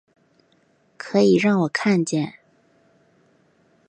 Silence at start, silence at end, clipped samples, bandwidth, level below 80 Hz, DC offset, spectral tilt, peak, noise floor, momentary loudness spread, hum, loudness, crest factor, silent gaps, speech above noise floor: 1 s; 1.6 s; under 0.1%; 9.4 kHz; -68 dBFS; under 0.1%; -6 dB/octave; -6 dBFS; -62 dBFS; 12 LU; none; -20 LUFS; 18 dB; none; 43 dB